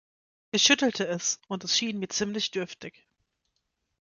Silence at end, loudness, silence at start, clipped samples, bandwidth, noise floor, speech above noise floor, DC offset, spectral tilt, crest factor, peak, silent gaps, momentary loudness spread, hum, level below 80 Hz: 1.15 s; -26 LUFS; 0.55 s; under 0.1%; 10.5 kHz; -79 dBFS; 51 dB; under 0.1%; -2 dB/octave; 24 dB; -6 dBFS; none; 15 LU; none; -70 dBFS